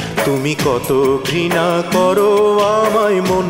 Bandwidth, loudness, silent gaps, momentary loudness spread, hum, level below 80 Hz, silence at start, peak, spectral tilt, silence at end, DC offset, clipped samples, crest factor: 16.5 kHz; -14 LUFS; none; 4 LU; none; -44 dBFS; 0 s; -2 dBFS; -5 dB/octave; 0 s; under 0.1%; under 0.1%; 12 dB